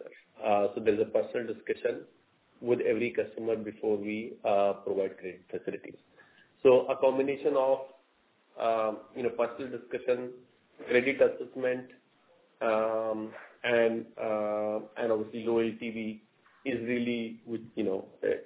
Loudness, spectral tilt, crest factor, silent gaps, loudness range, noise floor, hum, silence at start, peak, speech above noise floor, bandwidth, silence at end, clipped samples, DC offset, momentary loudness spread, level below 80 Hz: -31 LUFS; -9.5 dB/octave; 20 dB; none; 4 LU; -68 dBFS; none; 0 s; -10 dBFS; 38 dB; 4 kHz; 0 s; under 0.1%; under 0.1%; 12 LU; -72 dBFS